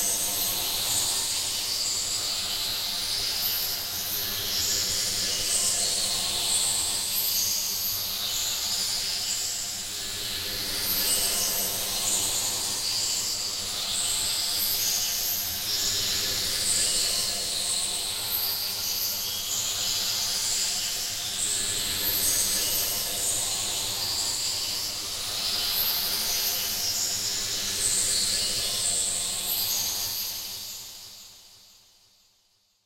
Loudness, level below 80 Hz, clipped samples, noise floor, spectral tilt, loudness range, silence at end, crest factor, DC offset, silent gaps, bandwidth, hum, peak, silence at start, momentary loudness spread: -25 LUFS; -50 dBFS; under 0.1%; -67 dBFS; 0.5 dB/octave; 2 LU; 1.25 s; 18 dB; under 0.1%; none; 16 kHz; none; -10 dBFS; 0 s; 5 LU